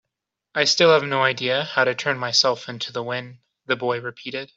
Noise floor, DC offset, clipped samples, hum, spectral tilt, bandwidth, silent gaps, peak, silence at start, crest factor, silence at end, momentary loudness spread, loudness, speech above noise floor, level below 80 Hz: -83 dBFS; under 0.1%; under 0.1%; none; -3 dB/octave; 8 kHz; none; -2 dBFS; 0.55 s; 20 dB; 0.1 s; 13 LU; -21 LUFS; 61 dB; -70 dBFS